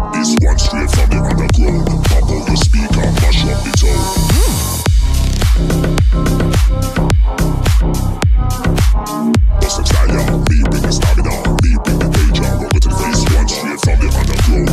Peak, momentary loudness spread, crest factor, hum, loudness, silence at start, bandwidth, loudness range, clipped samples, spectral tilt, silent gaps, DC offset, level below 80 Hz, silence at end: 0 dBFS; 2 LU; 10 dB; none; -14 LUFS; 0 s; 15 kHz; 1 LU; under 0.1%; -5 dB/octave; none; under 0.1%; -14 dBFS; 0 s